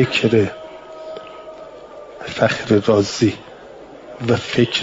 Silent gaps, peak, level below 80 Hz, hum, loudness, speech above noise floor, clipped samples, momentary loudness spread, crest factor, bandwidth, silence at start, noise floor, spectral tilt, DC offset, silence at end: none; -2 dBFS; -54 dBFS; none; -18 LUFS; 22 dB; under 0.1%; 22 LU; 18 dB; 7.8 kHz; 0 s; -39 dBFS; -5.5 dB/octave; under 0.1%; 0 s